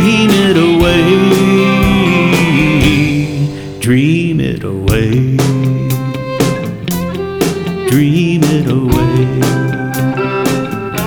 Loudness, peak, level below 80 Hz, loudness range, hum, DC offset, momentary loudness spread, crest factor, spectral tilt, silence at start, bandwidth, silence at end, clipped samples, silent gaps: -12 LUFS; 0 dBFS; -28 dBFS; 5 LU; none; under 0.1%; 8 LU; 12 dB; -6 dB/octave; 0 s; over 20 kHz; 0 s; under 0.1%; none